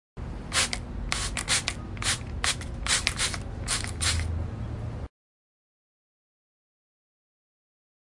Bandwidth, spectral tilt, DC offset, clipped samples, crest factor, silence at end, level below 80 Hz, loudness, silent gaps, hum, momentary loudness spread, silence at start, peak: 11.5 kHz; -2 dB/octave; under 0.1%; under 0.1%; 30 dB; 2.95 s; -40 dBFS; -28 LUFS; none; none; 11 LU; 0.15 s; -2 dBFS